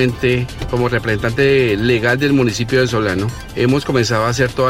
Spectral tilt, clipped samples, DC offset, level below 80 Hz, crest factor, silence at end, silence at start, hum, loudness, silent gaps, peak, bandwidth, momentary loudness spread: -5.5 dB/octave; under 0.1%; under 0.1%; -34 dBFS; 14 dB; 0 s; 0 s; none; -16 LUFS; none; -2 dBFS; 16 kHz; 5 LU